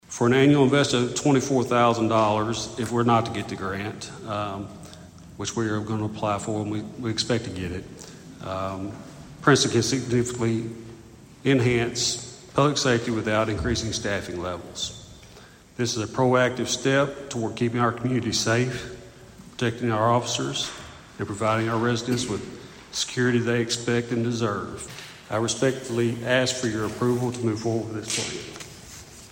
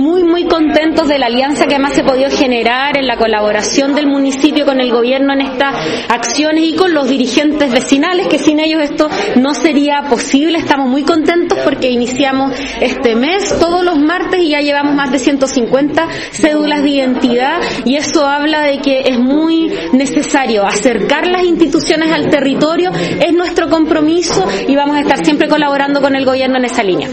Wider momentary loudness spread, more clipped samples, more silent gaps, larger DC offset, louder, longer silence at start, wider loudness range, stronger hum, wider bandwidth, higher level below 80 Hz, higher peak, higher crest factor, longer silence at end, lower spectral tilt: first, 17 LU vs 3 LU; second, under 0.1% vs 0.4%; neither; neither; second, -24 LUFS vs -11 LUFS; about the same, 0.1 s vs 0 s; first, 5 LU vs 1 LU; neither; first, 16.5 kHz vs 8.8 kHz; second, -52 dBFS vs -42 dBFS; second, -6 dBFS vs 0 dBFS; first, 20 dB vs 12 dB; about the same, 0 s vs 0 s; about the same, -4.5 dB/octave vs -4 dB/octave